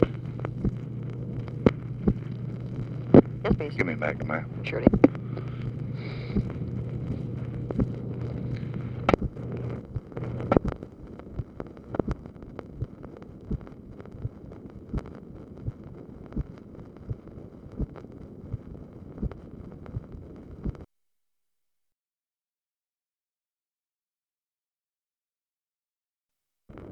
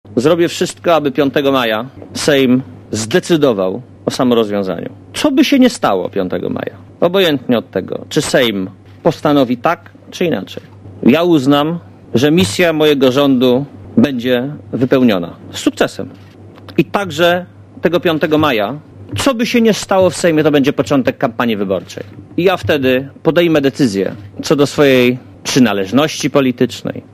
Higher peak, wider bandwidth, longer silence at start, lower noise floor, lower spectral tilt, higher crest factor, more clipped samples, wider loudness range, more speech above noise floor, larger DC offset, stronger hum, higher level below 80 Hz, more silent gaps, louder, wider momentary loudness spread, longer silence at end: about the same, 0 dBFS vs 0 dBFS; second, 7 kHz vs 15.5 kHz; about the same, 0 s vs 0.05 s; first, under -90 dBFS vs -35 dBFS; first, -9.5 dB/octave vs -5 dB/octave; first, 30 dB vs 14 dB; neither; first, 16 LU vs 3 LU; first, over 64 dB vs 22 dB; neither; neither; about the same, -44 dBFS vs -46 dBFS; neither; second, -30 LUFS vs -14 LUFS; first, 19 LU vs 11 LU; second, 0 s vs 0.15 s